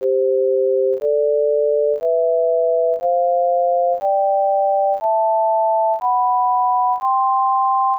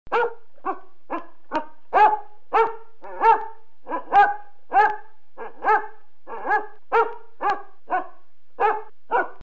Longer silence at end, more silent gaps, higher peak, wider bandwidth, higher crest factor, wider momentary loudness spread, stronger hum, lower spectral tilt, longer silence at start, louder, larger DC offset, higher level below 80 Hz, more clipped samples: about the same, 0 s vs 0.1 s; neither; second, -10 dBFS vs -6 dBFS; second, 2.7 kHz vs 7.4 kHz; second, 6 dB vs 18 dB; second, 1 LU vs 19 LU; neither; first, -7 dB/octave vs -5 dB/octave; about the same, 0 s vs 0.1 s; first, -17 LUFS vs -23 LUFS; second, under 0.1% vs 3%; second, -74 dBFS vs -62 dBFS; neither